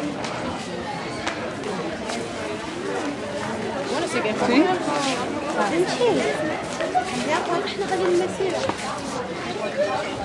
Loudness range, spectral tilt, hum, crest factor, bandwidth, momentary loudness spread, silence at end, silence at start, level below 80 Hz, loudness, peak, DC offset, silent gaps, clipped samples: 6 LU; -4 dB/octave; none; 20 dB; 11.5 kHz; 8 LU; 0 s; 0 s; -54 dBFS; -24 LUFS; -4 dBFS; under 0.1%; none; under 0.1%